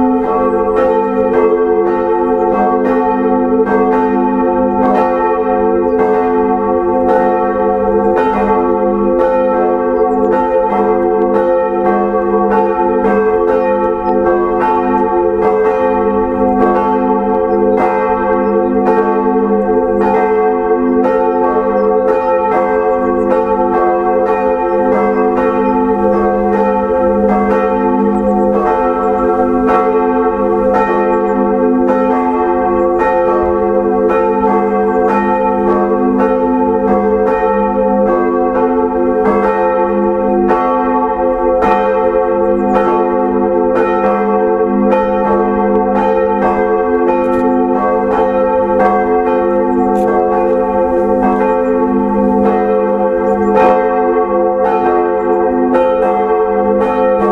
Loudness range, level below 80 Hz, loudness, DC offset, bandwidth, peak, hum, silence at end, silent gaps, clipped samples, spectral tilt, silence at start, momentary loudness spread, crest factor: 0 LU; -36 dBFS; -12 LUFS; under 0.1%; 5.6 kHz; 0 dBFS; none; 0 s; none; under 0.1%; -9 dB/octave; 0 s; 1 LU; 12 dB